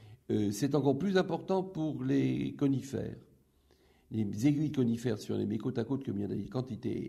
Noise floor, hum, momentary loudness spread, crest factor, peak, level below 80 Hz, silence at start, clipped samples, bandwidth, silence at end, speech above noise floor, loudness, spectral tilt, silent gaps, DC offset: -67 dBFS; none; 8 LU; 18 dB; -14 dBFS; -64 dBFS; 0 s; under 0.1%; 14.5 kHz; 0 s; 35 dB; -33 LUFS; -7 dB/octave; none; under 0.1%